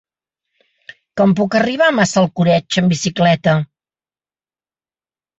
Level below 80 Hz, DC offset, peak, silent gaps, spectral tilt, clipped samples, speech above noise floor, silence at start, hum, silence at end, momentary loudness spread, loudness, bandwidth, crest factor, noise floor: -54 dBFS; under 0.1%; -2 dBFS; none; -5.5 dB/octave; under 0.1%; over 76 dB; 1.15 s; none; 1.75 s; 4 LU; -15 LUFS; 8.2 kHz; 16 dB; under -90 dBFS